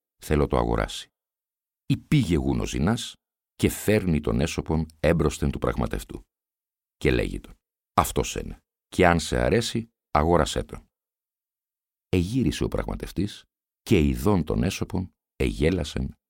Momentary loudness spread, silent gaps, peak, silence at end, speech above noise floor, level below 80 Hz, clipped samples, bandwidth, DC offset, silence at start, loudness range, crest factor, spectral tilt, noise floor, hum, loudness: 11 LU; none; -4 dBFS; 0.2 s; over 66 dB; -36 dBFS; under 0.1%; 17 kHz; under 0.1%; 0.2 s; 3 LU; 22 dB; -6 dB/octave; under -90 dBFS; none; -25 LUFS